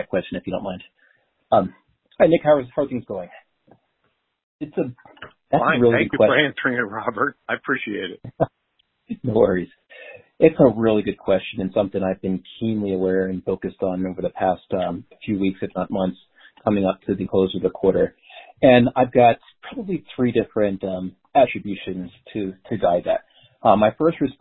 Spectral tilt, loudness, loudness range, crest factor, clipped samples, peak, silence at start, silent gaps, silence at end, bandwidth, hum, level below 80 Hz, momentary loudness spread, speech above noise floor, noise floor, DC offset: -11.5 dB/octave; -21 LUFS; 5 LU; 20 dB; under 0.1%; 0 dBFS; 0 s; 4.43-4.59 s; 0.1 s; 4.1 kHz; none; -50 dBFS; 14 LU; 50 dB; -70 dBFS; under 0.1%